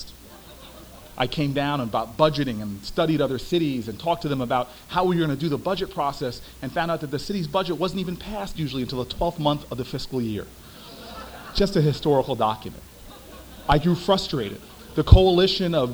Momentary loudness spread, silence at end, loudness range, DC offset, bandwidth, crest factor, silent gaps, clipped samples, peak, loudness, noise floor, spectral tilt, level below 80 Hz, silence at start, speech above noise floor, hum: 21 LU; 0 s; 5 LU; under 0.1%; over 20 kHz; 24 dB; none; under 0.1%; 0 dBFS; -24 LUFS; -44 dBFS; -6.5 dB/octave; -34 dBFS; 0 s; 22 dB; none